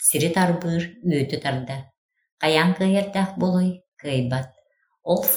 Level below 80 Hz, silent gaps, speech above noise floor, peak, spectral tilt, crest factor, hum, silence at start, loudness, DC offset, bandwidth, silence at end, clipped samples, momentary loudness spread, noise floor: -60 dBFS; 1.98-2.09 s, 2.32-2.38 s, 3.88-3.92 s; 42 dB; -2 dBFS; -4.5 dB/octave; 20 dB; none; 0 s; -22 LUFS; under 0.1%; over 20 kHz; 0 s; under 0.1%; 13 LU; -64 dBFS